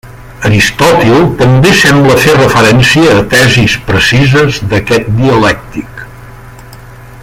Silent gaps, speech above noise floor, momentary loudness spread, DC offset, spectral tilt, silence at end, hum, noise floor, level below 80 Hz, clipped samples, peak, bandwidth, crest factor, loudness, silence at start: none; 23 dB; 8 LU; under 0.1%; -5 dB/octave; 0 s; none; -30 dBFS; -30 dBFS; 0.3%; 0 dBFS; 16.5 kHz; 8 dB; -6 LUFS; 0.05 s